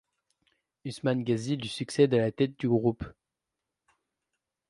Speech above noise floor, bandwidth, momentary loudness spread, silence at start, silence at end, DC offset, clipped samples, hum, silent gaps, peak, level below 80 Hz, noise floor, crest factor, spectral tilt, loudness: 60 dB; 11.5 kHz; 17 LU; 0.85 s; 1.6 s; under 0.1%; under 0.1%; none; none; -10 dBFS; -60 dBFS; -87 dBFS; 20 dB; -6.5 dB/octave; -28 LUFS